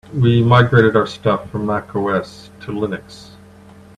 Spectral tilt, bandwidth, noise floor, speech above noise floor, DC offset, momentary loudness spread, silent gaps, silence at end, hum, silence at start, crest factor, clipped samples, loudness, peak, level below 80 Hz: -8 dB/octave; 9.2 kHz; -42 dBFS; 26 dB; under 0.1%; 17 LU; none; 0.75 s; none; 0.1 s; 16 dB; under 0.1%; -16 LUFS; 0 dBFS; -48 dBFS